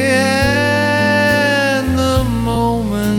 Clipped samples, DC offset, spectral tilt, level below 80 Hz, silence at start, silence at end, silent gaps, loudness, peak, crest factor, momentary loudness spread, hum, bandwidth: under 0.1%; under 0.1%; -5 dB/octave; -30 dBFS; 0 s; 0 s; none; -14 LUFS; -2 dBFS; 12 dB; 4 LU; none; 18 kHz